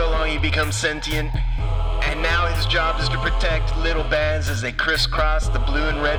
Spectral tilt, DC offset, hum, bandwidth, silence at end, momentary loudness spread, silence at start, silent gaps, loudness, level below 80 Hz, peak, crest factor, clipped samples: -4.5 dB/octave; 0.6%; none; 13.5 kHz; 0 s; 4 LU; 0 s; none; -21 LUFS; -24 dBFS; -6 dBFS; 14 dB; under 0.1%